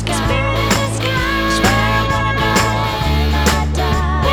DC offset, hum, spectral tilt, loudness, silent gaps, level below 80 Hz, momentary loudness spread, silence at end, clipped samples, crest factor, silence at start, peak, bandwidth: under 0.1%; none; -4.5 dB/octave; -15 LUFS; none; -22 dBFS; 3 LU; 0 s; under 0.1%; 16 dB; 0 s; 0 dBFS; over 20 kHz